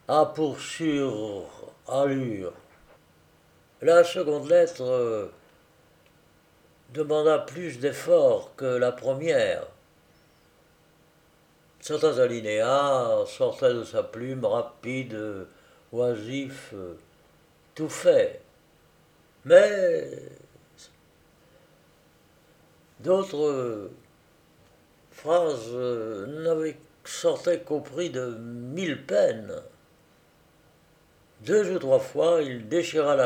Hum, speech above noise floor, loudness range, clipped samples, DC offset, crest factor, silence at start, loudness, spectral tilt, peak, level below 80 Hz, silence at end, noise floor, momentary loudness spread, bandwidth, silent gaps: none; 36 dB; 7 LU; under 0.1%; under 0.1%; 22 dB; 0.1 s; -25 LUFS; -5 dB/octave; -4 dBFS; -70 dBFS; 0 s; -61 dBFS; 17 LU; 15 kHz; none